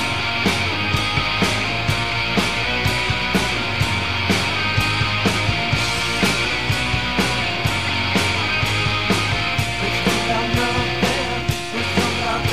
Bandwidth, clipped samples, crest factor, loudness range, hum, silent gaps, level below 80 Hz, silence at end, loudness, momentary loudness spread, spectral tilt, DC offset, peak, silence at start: 16 kHz; under 0.1%; 16 dB; 1 LU; none; none; -36 dBFS; 0 s; -19 LUFS; 2 LU; -4 dB/octave; 2%; -4 dBFS; 0 s